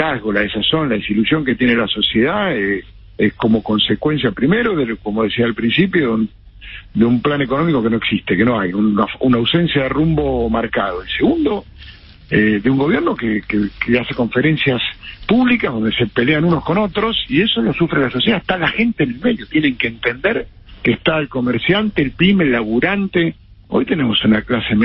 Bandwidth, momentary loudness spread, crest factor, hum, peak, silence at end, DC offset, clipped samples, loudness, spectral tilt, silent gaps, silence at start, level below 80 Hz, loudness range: 5.6 kHz; 5 LU; 14 dB; none; -2 dBFS; 0 s; under 0.1%; under 0.1%; -16 LUFS; -11.5 dB/octave; none; 0 s; -38 dBFS; 2 LU